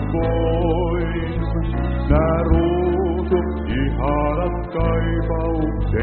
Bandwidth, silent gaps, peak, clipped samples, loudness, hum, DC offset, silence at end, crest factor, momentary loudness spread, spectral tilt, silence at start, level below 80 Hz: 4.3 kHz; none; -2 dBFS; under 0.1%; -20 LUFS; none; under 0.1%; 0 s; 16 dB; 5 LU; -7.5 dB/octave; 0 s; -24 dBFS